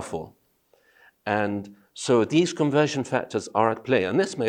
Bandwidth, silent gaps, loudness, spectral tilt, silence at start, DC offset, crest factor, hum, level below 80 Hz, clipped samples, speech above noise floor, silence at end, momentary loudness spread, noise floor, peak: 11 kHz; none; -24 LUFS; -5.5 dB/octave; 0 s; under 0.1%; 20 dB; none; -66 dBFS; under 0.1%; 40 dB; 0 s; 14 LU; -64 dBFS; -6 dBFS